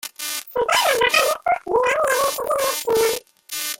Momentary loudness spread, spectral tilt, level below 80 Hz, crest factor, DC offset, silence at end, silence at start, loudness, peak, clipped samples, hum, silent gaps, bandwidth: 10 LU; -0.5 dB/octave; -56 dBFS; 18 dB; under 0.1%; 0.05 s; 0.05 s; -19 LUFS; -4 dBFS; under 0.1%; none; none; 17 kHz